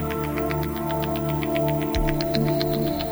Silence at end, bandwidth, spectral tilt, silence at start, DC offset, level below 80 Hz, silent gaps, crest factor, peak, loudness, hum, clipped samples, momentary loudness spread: 0 s; over 20 kHz; -6.5 dB/octave; 0 s; under 0.1%; -34 dBFS; none; 18 dB; -6 dBFS; -24 LUFS; none; under 0.1%; 3 LU